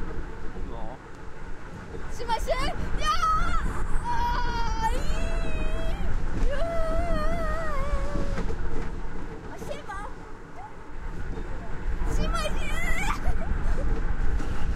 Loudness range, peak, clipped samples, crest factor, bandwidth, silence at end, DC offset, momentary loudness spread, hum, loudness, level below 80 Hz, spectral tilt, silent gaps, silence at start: 8 LU; -10 dBFS; under 0.1%; 14 dB; 11 kHz; 0 s; under 0.1%; 13 LU; none; -31 LUFS; -28 dBFS; -5.5 dB/octave; none; 0 s